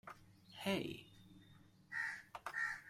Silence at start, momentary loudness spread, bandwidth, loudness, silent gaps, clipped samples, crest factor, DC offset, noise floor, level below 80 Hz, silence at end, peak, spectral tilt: 0.05 s; 22 LU; 16 kHz; -44 LUFS; none; under 0.1%; 20 dB; under 0.1%; -65 dBFS; -76 dBFS; 0 s; -26 dBFS; -4.5 dB/octave